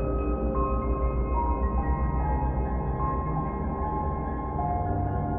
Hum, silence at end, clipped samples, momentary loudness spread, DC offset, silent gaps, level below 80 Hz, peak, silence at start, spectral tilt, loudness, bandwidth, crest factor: none; 0 s; under 0.1%; 3 LU; under 0.1%; none; -30 dBFS; -12 dBFS; 0 s; -11 dB/octave; -29 LUFS; 2.7 kHz; 14 dB